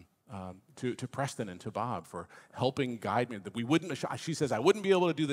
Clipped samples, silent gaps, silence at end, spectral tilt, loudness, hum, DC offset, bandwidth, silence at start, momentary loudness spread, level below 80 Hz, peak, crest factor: under 0.1%; none; 0 s; -5.5 dB/octave; -32 LUFS; none; under 0.1%; 15 kHz; 0.3 s; 17 LU; -76 dBFS; -10 dBFS; 22 dB